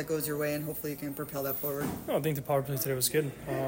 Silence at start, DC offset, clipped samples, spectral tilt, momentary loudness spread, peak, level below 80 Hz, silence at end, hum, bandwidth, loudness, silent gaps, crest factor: 0 s; under 0.1%; under 0.1%; -4.5 dB/octave; 7 LU; -14 dBFS; -58 dBFS; 0 s; none; 16.5 kHz; -32 LUFS; none; 18 dB